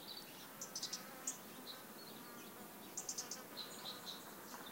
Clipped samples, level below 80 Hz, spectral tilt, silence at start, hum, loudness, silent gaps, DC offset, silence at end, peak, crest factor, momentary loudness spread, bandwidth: under 0.1%; -88 dBFS; -1 dB/octave; 0 s; none; -48 LUFS; none; under 0.1%; 0 s; -28 dBFS; 24 dB; 8 LU; 17 kHz